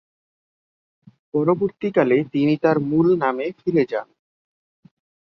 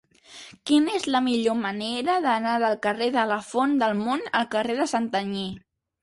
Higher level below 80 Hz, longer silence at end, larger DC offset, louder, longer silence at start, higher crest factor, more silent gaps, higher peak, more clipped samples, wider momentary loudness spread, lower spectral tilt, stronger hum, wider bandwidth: about the same, -62 dBFS vs -64 dBFS; first, 1.2 s vs 0.45 s; neither; first, -20 LUFS vs -24 LUFS; first, 1.35 s vs 0.3 s; about the same, 18 dB vs 16 dB; neither; first, -4 dBFS vs -8 dBFS; neither; about the same, 7 LU vs 9 LU; first, -9.5 dB/octave vs -4.5 dB/octave; neither; second, 6 kHz vs 11.5 kHz